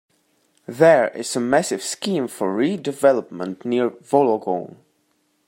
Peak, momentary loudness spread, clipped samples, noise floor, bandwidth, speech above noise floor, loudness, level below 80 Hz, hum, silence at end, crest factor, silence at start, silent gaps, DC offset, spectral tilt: -2 dBFS; 12 LU; under 0.1%; -66 dBFS; 16.5 kHz; 47 dB; -20 LUFS; -68 dBFS; none; 0.8 s; 20 dB; 0.7 s; none; under 0.1%; -4.5 dB/octave